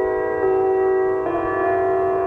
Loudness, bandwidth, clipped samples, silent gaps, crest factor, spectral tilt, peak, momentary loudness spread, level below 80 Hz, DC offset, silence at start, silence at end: -20 LUFS; 3.4 kHz; under 0.1%; none; 10 dB; -9 dB/octave; -8 dBFS; 3 LU; -48 dBFS; under 0.1%; 0 s; 0 s